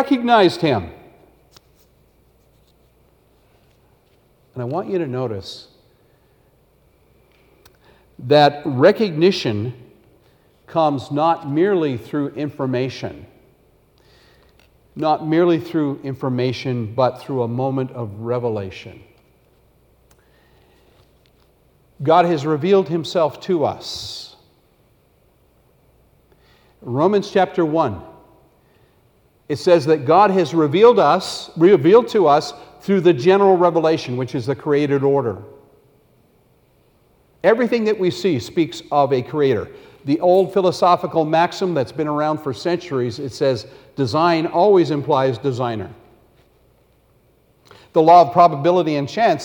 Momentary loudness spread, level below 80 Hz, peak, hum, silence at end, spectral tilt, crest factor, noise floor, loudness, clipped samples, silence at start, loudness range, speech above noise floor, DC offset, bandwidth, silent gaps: 14 LU; -58 dBFS; -2 dBFS; none; 0 s; -6.5 dB/octave; 18 dB; -57 dBFS; -18 LUFS; under 0.1%; 0 s; 14 LU; 40 dB; under 0.1%; 18.5 kHz; none